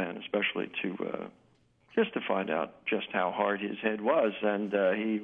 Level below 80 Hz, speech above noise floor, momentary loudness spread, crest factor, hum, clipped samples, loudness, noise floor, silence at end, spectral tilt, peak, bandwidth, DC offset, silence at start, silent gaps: -78 dBFS; 32 dB; 7 LU; 18 dB; none; under 0.1%; -31 LUFS; -63 dBFS; 0 s; -8 dB/octave; -12 dBFS; 3.9 kHz; under 0.1%; 0 s; none